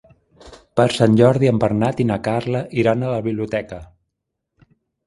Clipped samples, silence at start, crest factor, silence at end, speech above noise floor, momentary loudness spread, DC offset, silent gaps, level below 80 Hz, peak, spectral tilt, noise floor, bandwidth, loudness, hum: under 0.1%; 0.45 s; 20 dB; 1.2 s; 61 dB; 11 LU; under 0.1%; none; -48 dBFS; 0 dBFS; -7 dB/octave; -78 dBFS; 11.5 kHz; -18 LUFS; none